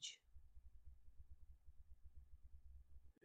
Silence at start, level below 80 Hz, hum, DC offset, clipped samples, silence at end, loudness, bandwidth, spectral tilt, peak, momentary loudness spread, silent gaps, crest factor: 0 s; -64 dBFS; none; under 0.1%; under 0.1%; 0 s; -65 LUFS; 8.2 kHz; -1 dB/octave; -38 dBFS; 5 LU; none; 22 dB